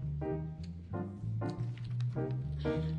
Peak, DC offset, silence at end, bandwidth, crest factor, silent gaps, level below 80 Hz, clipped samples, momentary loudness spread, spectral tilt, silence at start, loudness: -22 dBFS; under 0.1%; 0 s; 7.8 kHz; 14 dB; none; -52 dBFS; under 0.1%; 6 LU; -9 dB/octave; 0 s; -38 LUFS